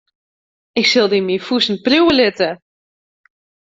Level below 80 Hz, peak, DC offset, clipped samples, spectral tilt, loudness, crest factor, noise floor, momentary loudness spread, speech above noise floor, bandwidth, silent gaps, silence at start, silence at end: -54 dBFS; -2 dBFS; under 0.1%; under 0.1%; -4 dB/octave; -15 LUFS; 16 dB; under -90 dBFS; 9 LU; over 75 dB; 7.8 kHz; none; 0.75 s; 1.15 s